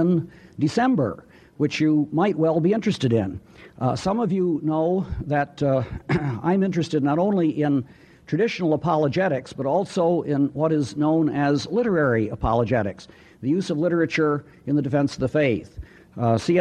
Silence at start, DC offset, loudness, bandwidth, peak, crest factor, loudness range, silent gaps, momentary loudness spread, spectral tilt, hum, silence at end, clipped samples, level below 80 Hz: 0 s; under 0.1%; -23 LUFS; 9.8 kHz; -6 dBFS; 16 dB; 2 LU; none; 6 LU; -7.5 dB/octave; none; 0 s; under 0.1%; -46 dBFS